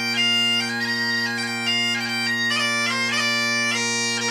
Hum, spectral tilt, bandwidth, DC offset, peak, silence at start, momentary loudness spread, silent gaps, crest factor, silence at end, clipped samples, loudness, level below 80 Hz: none; -1.5 dB/octave; 15.5 kHz; under 0.1%; -10 dBFS; 0 s; 4 LU; none; 12 dB; 0 s; under 0.1%; -20 LUFS; -74 dBFS